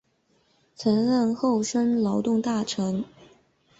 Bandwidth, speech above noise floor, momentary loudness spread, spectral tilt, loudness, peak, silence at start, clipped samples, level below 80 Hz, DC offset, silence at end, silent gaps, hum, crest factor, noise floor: 8 kHz; 43 dB; 7 LU; -5.5 dB/octave; -25 LUFS; -10 dBFS; 0.8 s; under 0.1%; -64 dBFS; under 0.1%; 0.75 s; none; none; 16 dB; -67 dBFS